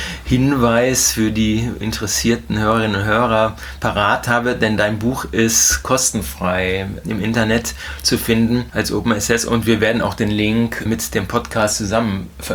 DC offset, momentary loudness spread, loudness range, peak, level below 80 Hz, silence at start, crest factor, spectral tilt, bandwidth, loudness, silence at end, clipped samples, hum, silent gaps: under 0.1%; 7 LU; 2 LU; 0 dBFS; -34 dBFS; 0 s; 16 dB; -4 dB/octave; over 20 kHz; -17 LUFS; 0 s; under 0.1%; none; none